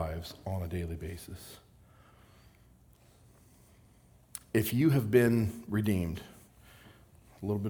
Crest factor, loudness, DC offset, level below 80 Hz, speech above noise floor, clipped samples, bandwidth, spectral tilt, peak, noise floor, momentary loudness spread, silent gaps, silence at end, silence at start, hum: 22 dB; -31 LUFS; under 0.1%; -56 dBFS; 31 dB; under 0.1%; over 20 kHz; -7 dB/octave; -12 dBFS; -61 dBFS; 21 LU; none; 0 s; 0 s; none